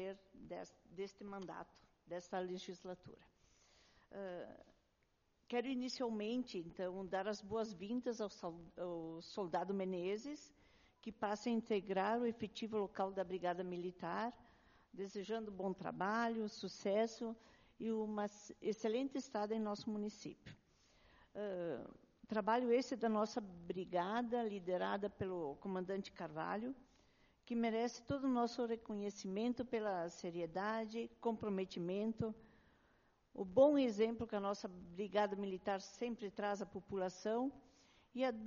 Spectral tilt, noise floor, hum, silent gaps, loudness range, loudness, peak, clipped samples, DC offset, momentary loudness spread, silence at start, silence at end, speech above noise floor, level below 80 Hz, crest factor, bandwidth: -4.5 dB/octave; -80 dBFS; none; none; 7 LU; -42 LUFS; -20 dBFS; under 0.1%; under 0.1%; 13 LU; 0 s; 0 s; 38 dB; -74 dBFS; 22 dB; 7.2 kHz